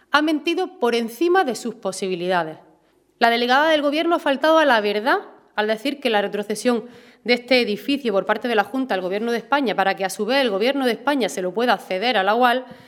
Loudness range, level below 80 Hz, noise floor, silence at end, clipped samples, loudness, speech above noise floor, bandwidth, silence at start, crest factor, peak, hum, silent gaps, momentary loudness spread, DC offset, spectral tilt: 3 LU; -70 dBFS; -59 dBFS; 0.15 s; under 0.1%; -20 LUFS; 38 dB; 19 kHz; 0.15 s; 20 dB; 0 dBFS; none; none; 7 LU; under 0.1%; -4 dB/octave